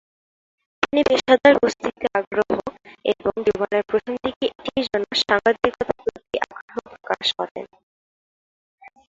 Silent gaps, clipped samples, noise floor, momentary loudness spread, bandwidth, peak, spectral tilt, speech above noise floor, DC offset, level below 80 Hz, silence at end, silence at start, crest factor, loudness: 2.27-2.31 s, 4.36-4.41 s, 6.61-6.68 s, 7.51-7.55 s, 7.83-8.78 s; under 0.1%; under -90 dBFS; 13 LU; 7.8 kHz; -2 dBFS; -4 dB/octave; over 70 dB; under 0.1%; -54 dBFS; 0.2 s; 0.8 s; 20 dB; -21 LUFS